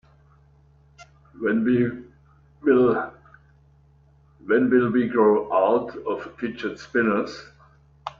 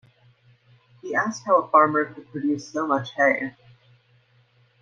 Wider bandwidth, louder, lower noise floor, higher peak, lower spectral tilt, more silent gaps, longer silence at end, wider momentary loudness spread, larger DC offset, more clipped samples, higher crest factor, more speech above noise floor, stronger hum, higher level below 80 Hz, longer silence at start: about the same, 7.2 kHz vs 7.6 kHz; about the same, -22 LUFS vs -23 LUFS; second, -56 dBFS vs -61 dBFS; about the same, -6 dBFS vs -4 dBFS; first, -7.5 dB/octave vs -5.5 dB/octave; neither; second, 0.05 s vs 1.3 s; first, 15 LU vs 12 LU; neither; neither; about the same, 18 dB vs 22 dB; about the same, 35 dB vs 38 dB; neither; first, -58 dBFS vs -72 dBFS; about the same, 1 s vs 1.05 s